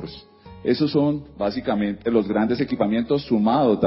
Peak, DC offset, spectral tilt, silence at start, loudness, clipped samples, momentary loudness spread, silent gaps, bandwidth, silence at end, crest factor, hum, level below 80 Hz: -6 dBFS; under 0.1%; -11.5 dB/octave; 0 s; -22 LUFS; under 0.1%; 7 LU; none; 5.8 kHz; 0 s; 16 dB; none; -50 dBFS